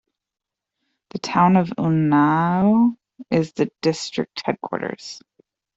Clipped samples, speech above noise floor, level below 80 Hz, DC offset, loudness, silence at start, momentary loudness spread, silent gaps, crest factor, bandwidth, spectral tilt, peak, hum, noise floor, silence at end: under 0.1%; 67 dB; -60 dBFS; under 0.1%; -20 LUFS; 1.15 s; 17 LU; none; 18 dB; 8 kHz; -6.5 dB/octave; -4 dBFS; none; -86 dBFS; 0.6 s